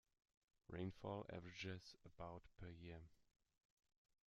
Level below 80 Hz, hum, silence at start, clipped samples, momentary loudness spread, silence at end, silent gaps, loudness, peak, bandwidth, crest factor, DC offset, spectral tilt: -74 dBFS; none; 0.7 s; under 0.1%; 9 LU; 1.05 s; none; -55 LUFS; -36 dBFS; 7.6 kHz; 20 dB; under 0.1%; -5 dB/octave